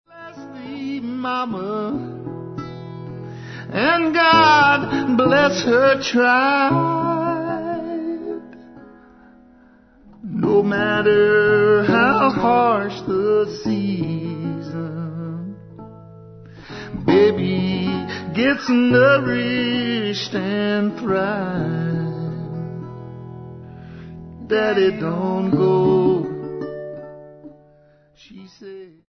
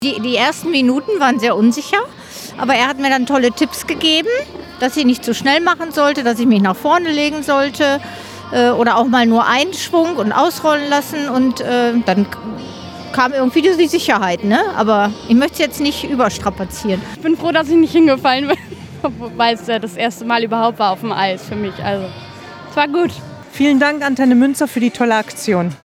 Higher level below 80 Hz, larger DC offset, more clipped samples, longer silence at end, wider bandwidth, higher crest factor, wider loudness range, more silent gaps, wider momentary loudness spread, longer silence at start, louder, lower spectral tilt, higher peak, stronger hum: about the same, -52 dBFS vs -50 dBFS; neither; neither; about the same, 0.2 s vs 0.2 s; second, 6.4 kHz vs 16.5 kHz; about the same, 16 dB vs 16 dB; first, 11 LU vs 4 LU; neither; first, 21 LU vs 10 LU; first, 0.15 s vs 0 s; second, -18 LUFS vs -15 LUFS; first, -6.5 dB/octave vs -4.5 dB/octave; second, -4 dBFS vs 0 dBFS; neither